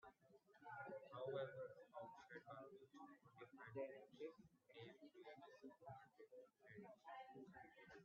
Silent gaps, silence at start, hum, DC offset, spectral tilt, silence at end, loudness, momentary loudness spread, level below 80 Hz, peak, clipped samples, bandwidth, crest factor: none; 0 s; none; under 0.1%; -4.5 dB/octave; 0 s; -59 LUFS; 12 LU; under -90 dBFS; -38 dBFS; under 0.1%; 6.8 kHz; 20 dB